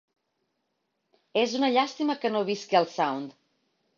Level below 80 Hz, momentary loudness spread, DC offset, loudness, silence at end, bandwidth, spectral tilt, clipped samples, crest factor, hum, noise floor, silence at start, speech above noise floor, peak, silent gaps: -78 dBFS; 7 LU; under 0.1%; -27 LUFS; 0.65 s; 7.6 kHz; -4.5 dB/octave; under 0.1%; 20 dB; none; -78 dBFS; 1.35 s; 52 dB; -8 dBFS; none